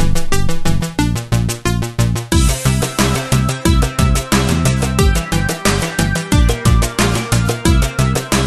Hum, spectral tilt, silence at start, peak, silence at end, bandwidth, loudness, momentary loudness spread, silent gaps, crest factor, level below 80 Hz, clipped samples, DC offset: none; -5 dB/octave; 0 s; 0 dBFS; 0 s; 13.5 kHz; -15 LUFS; 4 LU; none; 14 dB; -20 dBFS; under 0.1%; under 0.1%